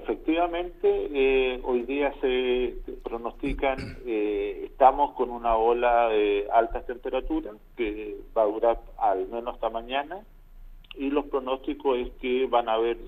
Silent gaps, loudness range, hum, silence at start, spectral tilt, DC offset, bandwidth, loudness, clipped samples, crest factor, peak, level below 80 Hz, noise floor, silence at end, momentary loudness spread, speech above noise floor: none; 5 LU; none; 0 s; -7 dB/octave; under 0.1%; 5.2 kHz; -26 LUFS; under 0.1%; 22 dB; -4 dBFS; -44 dBFS; -46 dBFS; 0 s; 11 LU; 20 dB